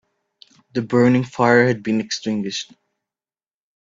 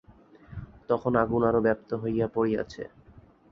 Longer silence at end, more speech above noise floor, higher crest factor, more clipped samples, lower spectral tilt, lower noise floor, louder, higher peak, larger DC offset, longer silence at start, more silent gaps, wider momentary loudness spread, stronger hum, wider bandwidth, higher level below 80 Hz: first, 1.3 s vs 0.3 s; first, over 72 dB vs 28 dB; about the same, 20 dB vs 20 dB; neither; second, -5.5 dB/octave vs -8.5 dB/octave; first, under -90 dBFS vs -54 dBFS; first, -19 LUFS vs -27 LUFS; first, -2 dBFS vs -8 dBFS; neither; first, 0.75 s vs 0.1 s; neither; second, 13 LU vs 20 LU; neither; first, 7.6 kHz vs 6.8 kHz; second, -62 dBFS vs -52 dBFS